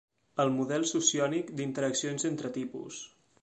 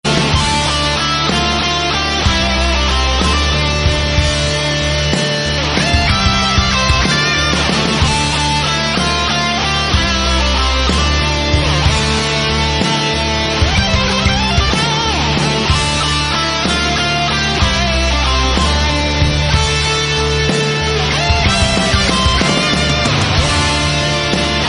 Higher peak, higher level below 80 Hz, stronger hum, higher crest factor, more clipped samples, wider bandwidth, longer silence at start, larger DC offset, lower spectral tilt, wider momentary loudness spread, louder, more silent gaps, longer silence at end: second, -12 dBFS vs 0 dBFS; second, -74 dBFS vs -20 dBFS; neither; first, 20 dB vs 14 dB; neither; second, 9 kHz vs 11 kHz; first, 0.35 s vs 0.05 s; neither; about the same, -3.5 dB/octave vs -4 dB/octave; first, 15 LU vs 2 LU; second, -31 LUFS vs -13 LUFS; neither; first, 0.35 s vs 0 s